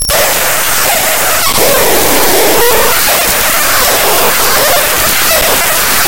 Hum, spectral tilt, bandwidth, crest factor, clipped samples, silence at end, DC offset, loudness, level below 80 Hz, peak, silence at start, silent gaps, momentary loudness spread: none; -1 dB/octave; over 20 kHz; 10 dB; 1%; 0 s; 10%; -7 LUFS; -30 dBFS; 0 dBFS; 0 s; none; 1 LU